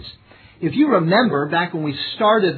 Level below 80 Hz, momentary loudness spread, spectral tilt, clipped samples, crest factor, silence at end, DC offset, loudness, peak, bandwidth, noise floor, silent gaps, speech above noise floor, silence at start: -58 dBFS; 9 LU; -9 dB/octave; under 0.1%; 16 dB; 0 s; under 0.1%; -18 LUFS; -4 dBFS; 4.6 kHz; -46 dBFS; none; 29 dB; 0 s